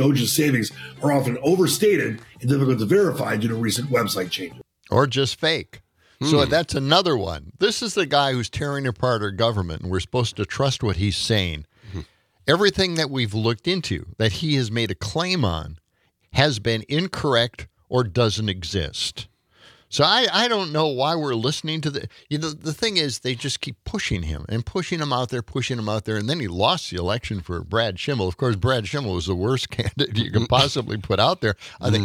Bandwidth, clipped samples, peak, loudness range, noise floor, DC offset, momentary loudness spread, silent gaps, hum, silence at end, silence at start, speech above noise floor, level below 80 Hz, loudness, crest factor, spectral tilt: 18 kHz; under 0.1%; 0 dBFS; 4 LU; -67 dBFS; under 0.1%; 9 LU; none; none; 0 s; 0 s; 45 dB; -48 dBFS; -22 LUFS; 22 dB; -5 dB/octave